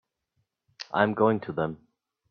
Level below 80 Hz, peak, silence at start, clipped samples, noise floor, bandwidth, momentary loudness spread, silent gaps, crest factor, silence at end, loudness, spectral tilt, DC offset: -66 dBFS; -6 dBFS; 0.8 s; under 0.1%; -77 dBFS; 6.8 kHz; 19 LU; none; 24 dB; 0.55 s; -27 LUFS; -7.5 dB/octave; under 0.1%